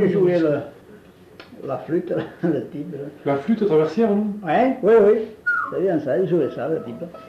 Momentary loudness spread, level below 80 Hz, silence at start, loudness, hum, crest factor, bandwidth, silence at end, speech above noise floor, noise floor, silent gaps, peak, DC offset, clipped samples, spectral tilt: 14 LU; -60 dBFS; 0 s; -20 LUFS; none; 14 dB; 7.2 kHz; 0 s; 26 dB; -46 dBFS; none; -6 dBFS; under 0.1%; under 0.1%; -8.5 dB/octave